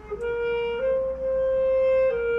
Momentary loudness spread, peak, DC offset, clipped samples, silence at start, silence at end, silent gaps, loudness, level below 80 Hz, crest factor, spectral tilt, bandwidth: 5 LU; -16 dBFS; under 0.1%; under 0.1%; 0 s; 0 s; none; -24 LUFS; -46 dBFS; 8 dB; -6 dB/octave; 5.6 kHz